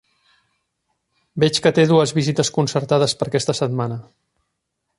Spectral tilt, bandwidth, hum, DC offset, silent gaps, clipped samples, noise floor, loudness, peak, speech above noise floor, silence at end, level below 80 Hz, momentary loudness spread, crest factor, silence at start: -5 dB/octave; 11.5 kHz; none; under 0.1%; none; under 0.1%; -76 dBFS; -18 LUFS; -2 dBFS; 58 dB; 0.95 s; -58 dBFS; 10 LU; 18 dB; 1.35 s